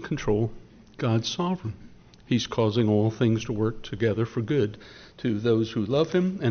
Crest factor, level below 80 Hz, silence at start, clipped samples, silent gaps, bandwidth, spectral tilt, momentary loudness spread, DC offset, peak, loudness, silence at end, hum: 16 dB; -50 dBFS; 0 s; under 0.1%; none; 6.6 kHz; -6.5 dB/octave; 9 LU; under 0.1%; -10 dBFS; -26 LUFS; 0 s; none